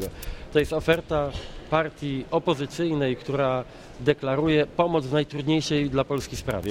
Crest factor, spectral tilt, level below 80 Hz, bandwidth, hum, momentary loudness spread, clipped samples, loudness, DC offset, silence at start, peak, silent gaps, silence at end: 20 dB; -6 dB/octave; -44 dBFS; 17 kHz; none; 8 LU; under 0.1%; -25 LUFS; under 0.1%; 0 s; -6 dBFS; none; 0 s